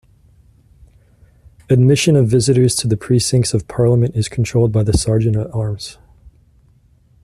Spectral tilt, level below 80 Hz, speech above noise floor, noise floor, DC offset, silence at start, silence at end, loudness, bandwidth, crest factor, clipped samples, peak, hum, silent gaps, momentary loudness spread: -6 dB/octave; -38 dBFS; 38 dB; -52 dBFS; under 0.1%; 1.7 s; 1.3 s; -15 LUFS; 13 kHz; 14 dB; under 0.1%; -2 dBFS; none; none; 8 LU